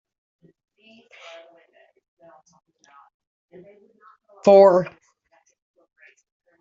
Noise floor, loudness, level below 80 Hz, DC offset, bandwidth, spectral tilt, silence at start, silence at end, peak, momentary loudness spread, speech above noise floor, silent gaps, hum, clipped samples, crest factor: -64 dBFS; -15 LUFS; -72 dBFS; under 0.1%; 7.4 kHz; -5.5 dB/octave; 4.45 s; 1.75 s; -2 dBFS; 30 LU; 46 dB; none; none; under 0.1%; 22 dB